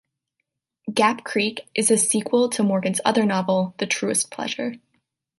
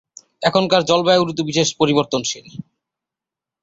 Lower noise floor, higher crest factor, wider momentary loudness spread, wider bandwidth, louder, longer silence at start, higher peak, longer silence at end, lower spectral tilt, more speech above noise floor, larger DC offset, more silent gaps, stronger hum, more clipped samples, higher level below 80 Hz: second, -79 dBFS vs -87 dBFS; about the same, 18 dB vs 18 dB; second, 8 LU vs 13 LU; first, 12 kHz vs 8 kHz; second, -21 LUFS vs -17 LUFS; first, 0.85 s vs 0.4 s; about the same, -4 dBFS vs -2 dBFS; second, 0.65 s vs 1 s; about the same, -3.5 dB/octave vs -4 dB/octave; second, 58 dB vs 70 dB; neither; neither; neither; neither; second, -70 dBFS vs -58 dBFS